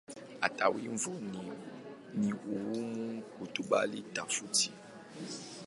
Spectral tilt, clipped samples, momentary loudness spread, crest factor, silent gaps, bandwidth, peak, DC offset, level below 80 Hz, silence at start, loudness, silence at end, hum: -3 dB/octave; under 0.1%; 16 LU; 26 dB; none; 11.5 kHz; -10 dBFS; under 0.1%; -78 dBFS; 0.1 s; -35 LUFS; 0 s; none